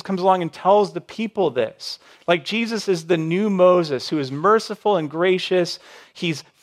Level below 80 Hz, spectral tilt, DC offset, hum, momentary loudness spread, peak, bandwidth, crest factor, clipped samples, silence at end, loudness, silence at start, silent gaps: -72 dBFS; -5.5 dB/octave; under 0.1%; none; 11 LU; -2 dBFS; 13.5 kHz; 18 dB; under 0.1%; 0.2 s; -20 LUFS; 0.05 s; none